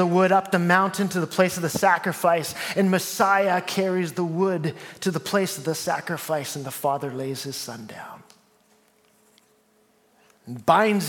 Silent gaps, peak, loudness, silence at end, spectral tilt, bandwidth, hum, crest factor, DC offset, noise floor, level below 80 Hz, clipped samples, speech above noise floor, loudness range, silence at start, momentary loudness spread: none; -2 dBFS; -23 LUFS; 0 s; -5 dB/octave; 17.5 kHz; none; 22 dB; under 0.1%; -62 dBFS; -70 dBFS; under 0.1%; 39 dB; 13 LU; 0 s; 12 LU